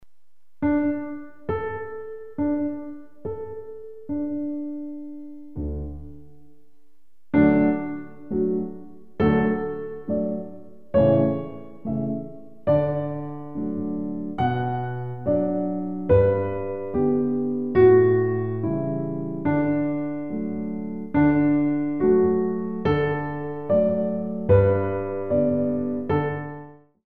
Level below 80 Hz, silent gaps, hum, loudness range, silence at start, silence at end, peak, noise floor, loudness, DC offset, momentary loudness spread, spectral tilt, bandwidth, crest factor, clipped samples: -46 dBFS; none; none; 9 LU; 0 s; 0.05 s; -6 dBFS; -79 dBFS; -24 LUFS; 0.9%; 17 LU; -11 dB/octave; 4.3 kHz; 18 dB; under 0.1%